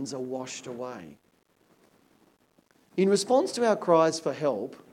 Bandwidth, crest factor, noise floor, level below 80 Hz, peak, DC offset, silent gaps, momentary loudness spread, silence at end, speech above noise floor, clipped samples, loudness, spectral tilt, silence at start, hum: 15.5 kHz; 20 dB; -65 dBFS; -80 dBFS; -10 dBFS; under 0.1%; none; 15 LU; 0.15 s; 39 dB; under 0.1%; -27 LUFS; -5 dB/octave; 0 s; none